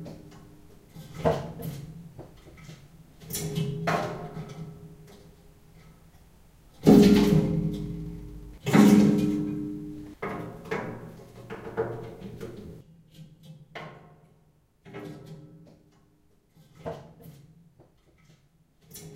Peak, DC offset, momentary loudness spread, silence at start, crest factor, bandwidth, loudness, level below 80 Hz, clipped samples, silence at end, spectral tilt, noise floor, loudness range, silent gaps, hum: -4 dBFS; under 0.1%; 29 LU; 0 s; 24 dB; 16 kHz; -25 LUFS; -50 dBFS; under 0.1%; 0 s; -6.5 dB/octave; -63 dBFS; 25 LU; none; none